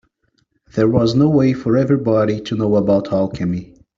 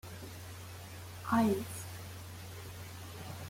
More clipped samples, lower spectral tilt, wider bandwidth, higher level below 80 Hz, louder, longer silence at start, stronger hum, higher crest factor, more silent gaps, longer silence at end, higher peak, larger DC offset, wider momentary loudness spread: neither; first, -8.5 dB/octave vs -5.5 dB/octave; second, 7.4 kHz vs 16.5 kHz; first, -48 dBFS vs -64 dBFS; first, -17 LUFS vs -39 LUFS; first, 0.75 s vs 0.05 s; neither; second, 14 dB vs 20 dB; neither; first, 0.35 s vs 0 s; first, -2 dBFS vs -18 dBFS; neither; second, 9 LU vs 17 LU